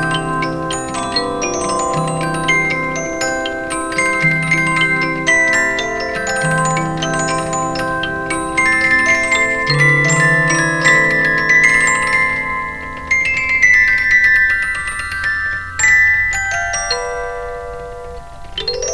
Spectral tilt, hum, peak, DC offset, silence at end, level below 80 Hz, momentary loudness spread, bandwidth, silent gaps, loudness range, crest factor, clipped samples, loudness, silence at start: -3 dB/octave; none; 0 dBFS; under 0.1%; 0 s; -38 dBFS; 11 LU; 11 kHz; none; 5 LU; 16 dB; under 0.1%; -14 LUFS; 0 s